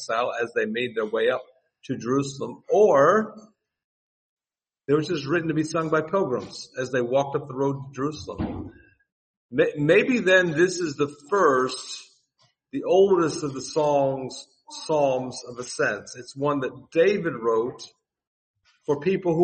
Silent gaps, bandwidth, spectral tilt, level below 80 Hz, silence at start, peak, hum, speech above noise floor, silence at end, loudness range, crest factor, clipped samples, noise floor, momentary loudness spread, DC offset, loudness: 3.84-4.37 s, 9.12-9.49 s, 18.27-18.54 s; 8.8 kHz; -5.5 dB/octave; -60 dBFS; 0 s; -6 dBFS; none; over 67 dB; 0 s; 5 LU; 20 dB; under 0.1%; under -90 dBFS; 16 LU; under 0.1%; -24 LUFS